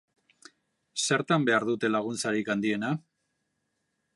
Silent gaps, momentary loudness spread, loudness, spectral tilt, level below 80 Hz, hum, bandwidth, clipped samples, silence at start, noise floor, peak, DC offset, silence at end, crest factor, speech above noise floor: none; 8 LU; -28 LUFS; -4 dB/octave; -76 dBFS; none; 11.5 kHz; under 0.1%; 0.95 s; -79 dBFS; -12 dBFS; under 0.1%; 1.15 s; 20 dB; 52 dB